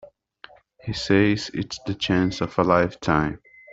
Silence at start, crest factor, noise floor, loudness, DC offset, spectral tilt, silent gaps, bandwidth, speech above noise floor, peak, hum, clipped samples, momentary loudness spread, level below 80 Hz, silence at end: 0.05 s; 20 dB; -50 dBFS; -23 LUFS; under 0.1%; -6 dB/octave; none; 8 kHz; 28 dB; -4 dBFS; none; under 0.1%; 11 LU; -48 dBFS; 0 s